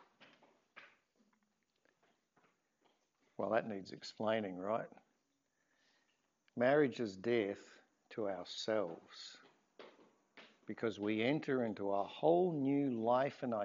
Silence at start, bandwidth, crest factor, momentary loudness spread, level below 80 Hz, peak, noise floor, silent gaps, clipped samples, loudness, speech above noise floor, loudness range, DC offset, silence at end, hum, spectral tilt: 0.75 s; 7.4 kHz; 22 dB; 18 LU; under -90 dBFS; -18 dBFS; -83 dBFS; none; under 0.1%; -37 LUFS; 46 dB; 8 LU; under 0.1%; 0 s; none; -4.5 dB/octave